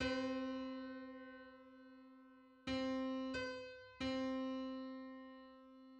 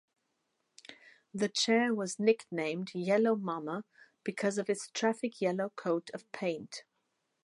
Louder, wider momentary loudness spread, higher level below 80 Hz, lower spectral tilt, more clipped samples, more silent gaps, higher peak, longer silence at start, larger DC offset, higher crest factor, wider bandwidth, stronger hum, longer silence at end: second, -45 LUFS vs -33 LUFS; first, 20 LU vs 17 LU; first, -68 dBFS vs -86 dBFS; about the same, -5 dB/octave vs -4.5 dB/octave; neither; neither; second, -28 dBFS vs -14 dBFS; second, 0 s vs 0.9 s; neither; about the same, 18 dB vs 20 dB; second, 8.6 kHz vs 11.5 kHz; neither; second, 0 s vs 0.65 s